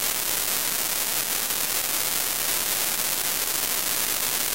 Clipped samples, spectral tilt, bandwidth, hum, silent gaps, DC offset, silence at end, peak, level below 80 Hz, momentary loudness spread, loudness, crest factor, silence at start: under 0.1%; 0.5 dB/octave; 16 kHz; none; none; 0.6%; 0 s; -4 dBFS; -56 dBFS; 1 LU; -23 LUFS; 22 dB; 0 s